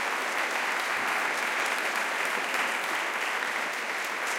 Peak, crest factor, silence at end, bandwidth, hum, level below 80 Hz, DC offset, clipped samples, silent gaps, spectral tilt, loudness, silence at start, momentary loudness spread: -14 dBFS; 16 dB; 0 s; 17 kHz; none; -84 dBFS; under 0.1%; under 0.1%; none; 0 dB/octave; -28 LUFS; 0 s; 3 LU